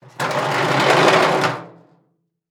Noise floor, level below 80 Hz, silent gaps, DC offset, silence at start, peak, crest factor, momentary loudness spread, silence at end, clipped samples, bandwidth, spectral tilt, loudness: -66 dBFS; -64 dBFS; none; under 0.1%; 0.2 s; 0 dBFS; 18 dB; 10 LU; 0.8 s; under 0.1%; 20 kHz; -4 dB/octave; -16 LUFS